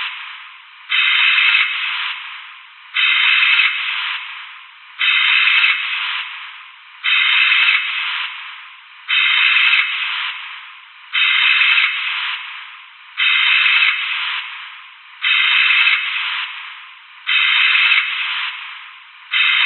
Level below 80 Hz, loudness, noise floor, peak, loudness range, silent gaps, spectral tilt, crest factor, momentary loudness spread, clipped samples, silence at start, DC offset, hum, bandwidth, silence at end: under -90 dBFS; -14 LUFS; -39 dBFS; 0 dBFS; 3 LU; none; 20.5 dB/octave; 18 dB; 20 LU; under 0.1%; 0 s; under 0.1%; none; 4.4 kHz; 0 s